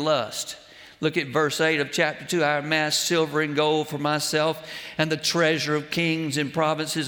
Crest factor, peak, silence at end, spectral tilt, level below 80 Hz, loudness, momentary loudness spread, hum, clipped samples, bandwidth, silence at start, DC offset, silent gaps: 18 dB; -6 dBFS; 0 s; -3.5 dB/octave; -66 dBFS; -24 LUFS; 6 LU; none; under 0.1%; over 20 kHz; 0 s; under 0.1%; none